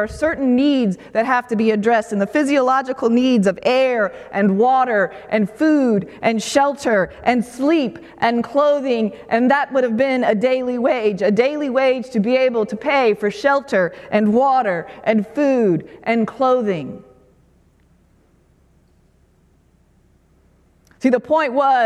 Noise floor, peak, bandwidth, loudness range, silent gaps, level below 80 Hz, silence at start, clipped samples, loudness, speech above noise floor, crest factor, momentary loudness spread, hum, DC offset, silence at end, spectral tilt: -56 dBFS; 0 dBFS; 12.5 kHz; 6 LU; none; -54 dBFS; 0 s; under 0.1%; -18 LUFS; 39 dB; 16 dB; 5 LU; none; under 0.1%; 0 s; -6 dB/octave